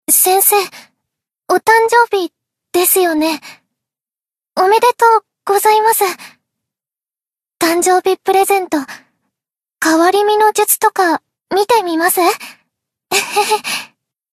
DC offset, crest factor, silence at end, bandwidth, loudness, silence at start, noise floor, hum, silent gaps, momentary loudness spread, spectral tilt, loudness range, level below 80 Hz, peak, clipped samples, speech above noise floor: under 0.1%; 14 dB; 0.5 s; 14 kHz; -13 LUFS; 0.1 s; under -90 dBFS; none; none; 11 LU; -1 dB/octave; 3 LU; -66 dBFS; 0 dBFS; under 0.1%; over 77 dB